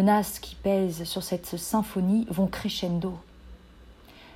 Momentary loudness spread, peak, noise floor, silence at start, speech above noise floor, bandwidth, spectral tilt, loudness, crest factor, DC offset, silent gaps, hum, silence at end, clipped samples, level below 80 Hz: 7 LU; -12 dBFS; -51 dBFS; 0 s; 24 dB; 16 kHz; -5.5 dB/octave; -28 LUFS; 16 dB; under 0.1%; none; none; 0 s; under 0.1%; -50 dBFS